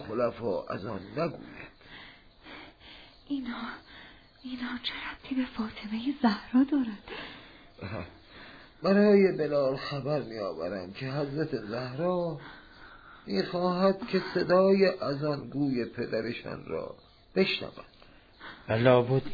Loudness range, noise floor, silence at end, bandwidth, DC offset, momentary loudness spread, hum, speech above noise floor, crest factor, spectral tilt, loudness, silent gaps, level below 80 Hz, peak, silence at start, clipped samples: 11 LU; -55 dBFS; 0 s; 5 kHz; under 0.1%; 25 LU; none; 26 dB; 20 dB; -8 dB/octave; -29 LUFS; none; -60 dBFS; -10 dBFS; 0 s; under 0.1%